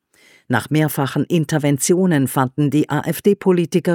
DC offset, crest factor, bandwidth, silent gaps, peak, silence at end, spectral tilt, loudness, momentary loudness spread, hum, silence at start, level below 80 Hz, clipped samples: under 0.1%; 16 dB; 18 kHz; none; -2 dBFS; 0 s; -6 dB/octave; -18 LUFS; 4 LU; none; 0.5 s; -60 dBFS; under 0.1%